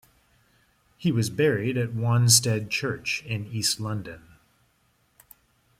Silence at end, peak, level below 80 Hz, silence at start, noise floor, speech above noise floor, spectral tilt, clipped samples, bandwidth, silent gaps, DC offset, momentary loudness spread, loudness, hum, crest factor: 1.6 s; -4 dBFS; -60 dBFS; 1 s; -67 dBFS; 42 dB; -4 dB/octave; under 0.1%; 16 kHz; none; under 0.1%; 13 LU; -24 LUFS; none; 24 dB